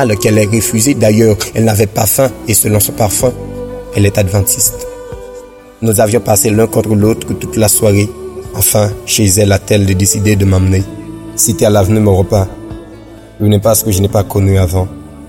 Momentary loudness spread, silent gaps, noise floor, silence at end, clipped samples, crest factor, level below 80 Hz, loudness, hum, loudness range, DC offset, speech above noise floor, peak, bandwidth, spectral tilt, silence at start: 15 LU; none; -33 dBFS; 0 s; under 0.1%; 12 dB; -34 dBFS; -11 LUFS; none; 2 LU; under 0.1%; 23 dB; 0 dBFS; 17 kHz; -5 dB/octave; 0 s